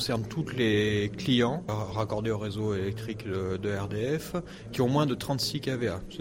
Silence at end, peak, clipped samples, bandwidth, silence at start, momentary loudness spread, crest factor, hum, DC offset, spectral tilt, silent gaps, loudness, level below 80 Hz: 0 s; -14 dBFS; under 0.1%; 16 kHz; 0 s; 7 LU; 16 dB; none; under 0.1%; -6 dB/octave; none; -30 LUFS; -52 dBFS